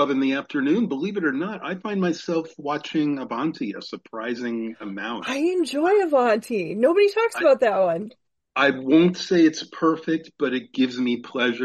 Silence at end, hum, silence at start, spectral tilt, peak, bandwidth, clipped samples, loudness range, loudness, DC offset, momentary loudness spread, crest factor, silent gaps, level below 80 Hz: 0 s; none; 0 s; -5.5 dB/octave; -6 dBFS; 12.5 kHz; under 0.1%; 7 LU; -23 LUFS; under 0.1%; 12 LU; 16 dB; none; -72 dBFS